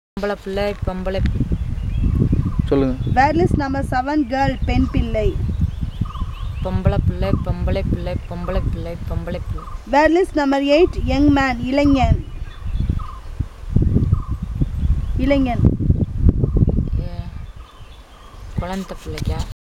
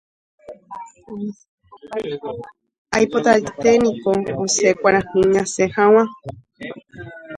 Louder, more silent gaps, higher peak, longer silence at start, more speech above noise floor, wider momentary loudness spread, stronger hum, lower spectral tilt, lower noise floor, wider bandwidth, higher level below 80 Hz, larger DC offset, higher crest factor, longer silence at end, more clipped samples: second, -20 LUFS vs -17 LUFS; second, none vs 1.49-1.58 s, 2.78-2.85 s; about the same, 0 dBFS vs 0 dBFS; second, 0.15 s vs 0.5 s; about the same, 22 dB vs 19 dB; second, 13 LU vs 21 LU; neither; first, -8 dB/octave vs -4 dB/octave; about the same, -40 dBFS vs -37 dBFS; first, 12.5 kHz vs 11 kHz; first, -24 dBFS vs -52 dBFS; neither; about the same, 18 dB vs 20 dB; first, 0.15 s vs 0 s; neither